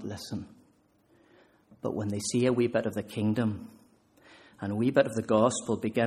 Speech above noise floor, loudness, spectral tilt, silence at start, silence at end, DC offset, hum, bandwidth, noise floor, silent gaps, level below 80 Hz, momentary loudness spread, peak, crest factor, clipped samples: 37 dB; -29 LUFS; -5.5 dB/octave; 0 s; 0 s; under 0.1%; none; 14 kHz; -65 dBFS; none; -66 dBFS; 14 LU; -8 dBFS; 22 dB; under 0.1%